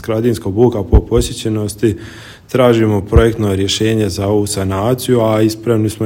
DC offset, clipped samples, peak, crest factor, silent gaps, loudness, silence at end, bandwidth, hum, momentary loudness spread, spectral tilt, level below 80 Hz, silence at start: under 0.1%; 0.4%; 0 dBFS; 14 dB; none; -14 LUFS; 0 s; 16.5 kHz; none; 7 LU; -6 dB/octave; -24 dBFS; 0 s